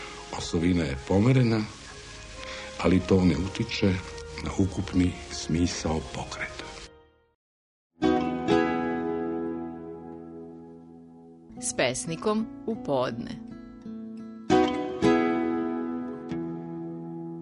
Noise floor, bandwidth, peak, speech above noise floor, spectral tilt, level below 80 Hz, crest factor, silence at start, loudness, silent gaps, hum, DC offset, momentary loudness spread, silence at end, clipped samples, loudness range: -56 dBFS; 10.5 kHz; -8 dBFS; 30 dB; -6 dB/octave; -48 dBFS; 20 dB; 0 s; -28 LUFS; 7.35-7.90 s; none; under 0.1%; 19 LU; 0 s; under 0.1%; 6 LU